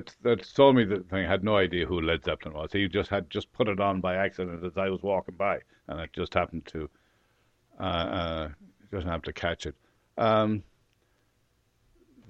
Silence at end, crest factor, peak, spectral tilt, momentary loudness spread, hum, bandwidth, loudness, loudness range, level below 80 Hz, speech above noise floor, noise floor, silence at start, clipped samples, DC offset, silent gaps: 1.65 s; 24 dB; -6 dBFS; -7 dB/octave; 13 LU; none; 8.2 kHz; -28 LUFS; 8 LU; -50 dBFS; 42 dB; -70 dBFS; 0 s; under 0.1%; under 0.1%; none